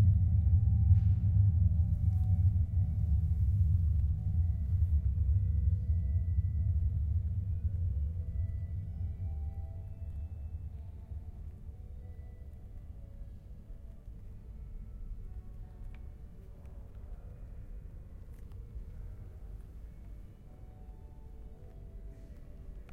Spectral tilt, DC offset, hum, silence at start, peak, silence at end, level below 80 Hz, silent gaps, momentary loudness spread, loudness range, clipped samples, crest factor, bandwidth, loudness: -11 dB/octave; under 0.1%; none; 0 s; -14 dBFS; 0 s; -36 dBFS; none; 23 LU; 20 LU; under 0.1%; 18 dB; 2.1 kHz; -32 LUFS